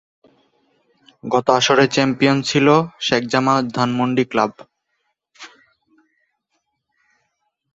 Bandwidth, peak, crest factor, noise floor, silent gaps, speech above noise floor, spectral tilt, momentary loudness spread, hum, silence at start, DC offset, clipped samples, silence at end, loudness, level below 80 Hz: 8 kHz; 0 dBFS; 20 dB; -72 dBFS; none; 56 dB; -4.5 dB/octave; 6 LU; none; 1.25 s; under 0.1%; under 0.1%; 2.25 s; -17 LUFS; -60 dBFS